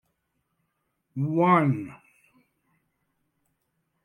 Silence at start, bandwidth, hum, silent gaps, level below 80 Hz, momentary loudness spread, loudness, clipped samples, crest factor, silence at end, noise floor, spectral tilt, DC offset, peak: 1.15 s; 9.8 kHz; none; none; -72 dBFS; 20 LU; -24 LUFS; under 0.1%; 20 dB; 2.1 s; -77 dBFS; -9.5 dB/octave; under 0.1%; -8 dBFS